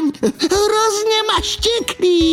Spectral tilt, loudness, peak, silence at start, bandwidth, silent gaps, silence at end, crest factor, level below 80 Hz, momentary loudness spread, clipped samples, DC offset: -3 dB/octave; -16 LUFS; -2 dBFS; 0 s; 16 kHz; none; 0 s; 14 dB; -36 dBFS; 3 LU; under 0.1%; under 0.1%